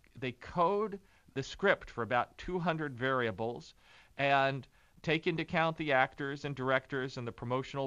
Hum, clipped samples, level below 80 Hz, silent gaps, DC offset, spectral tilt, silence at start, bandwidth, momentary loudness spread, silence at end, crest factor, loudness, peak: none; under 0.1%; -60 dBFS; none; under 0.1%; -6 dB/octave; 0.15 s; 11 kHz; 12 LU; 0 s; 22 dB; -34 LUFS; -12 dBFS